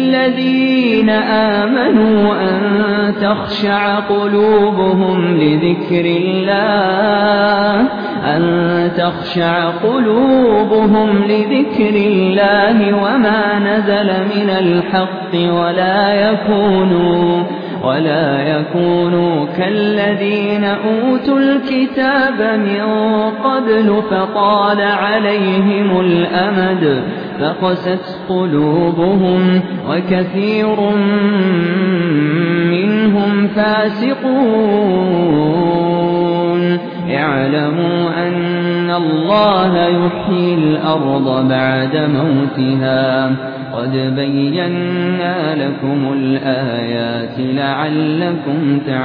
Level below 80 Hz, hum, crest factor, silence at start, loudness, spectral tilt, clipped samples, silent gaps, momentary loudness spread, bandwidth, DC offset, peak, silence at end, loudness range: -50 dBFS; none; 12 dB; 0 s; -14 LUFS; -9.5 dB/octave; under 0.1%; none; 5 LU; 5.2 kHz; 0.2%; 0 dBFS; 0 s; 3 LU